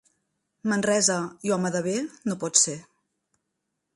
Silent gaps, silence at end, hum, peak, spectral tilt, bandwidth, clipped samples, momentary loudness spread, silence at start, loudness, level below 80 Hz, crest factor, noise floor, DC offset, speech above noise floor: none; 1.15 s; none; -4 dBFS; -3 dB/octave; 11.5 kHz; under 0.1%; 10 LU; 0.65 s; -24 LUFS; -72 dBFS; 24 dB; -80 dBFS; under 0.1%; 55 dB